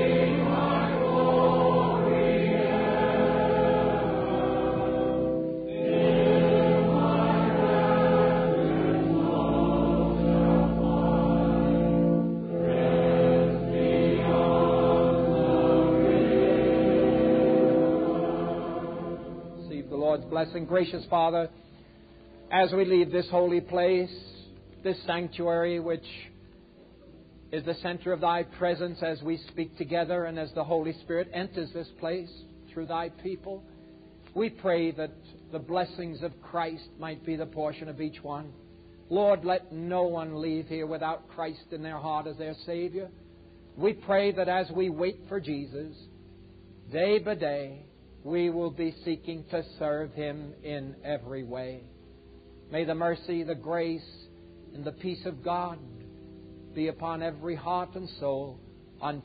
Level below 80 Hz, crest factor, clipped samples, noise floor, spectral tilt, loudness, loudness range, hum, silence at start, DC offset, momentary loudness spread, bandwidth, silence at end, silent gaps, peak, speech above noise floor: -48 dBFS; 16 dB; under 0.1%; -53 dBFS; -11.5 dB/octave; -27 LUFS; 12 LU; none; 0 s; under 0.1%; 16 LU; 5 kHz; 0.05 s; none; -10 dBFS; 23 dB